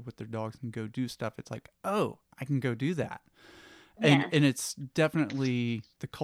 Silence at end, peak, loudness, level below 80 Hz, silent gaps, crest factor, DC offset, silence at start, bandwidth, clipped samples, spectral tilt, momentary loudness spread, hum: 0 s; -10 dBFS; -30 LUFS; -68 dBFS; none; 20 dB; under 0.1%; 0 s; 15.5 kHz; under 0.1%; -5.5 dB/octave; 15 LU; none